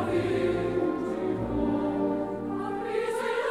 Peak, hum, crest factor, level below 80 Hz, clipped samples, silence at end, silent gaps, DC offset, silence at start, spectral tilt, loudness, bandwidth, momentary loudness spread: -16 dBFS; none; 12 dB; -50 dBFS; under 0.1%; 0 s; none; 0.1%; 0 s; -7 dB/octave; -29 LUFS; 13.5 kHz; 5 LU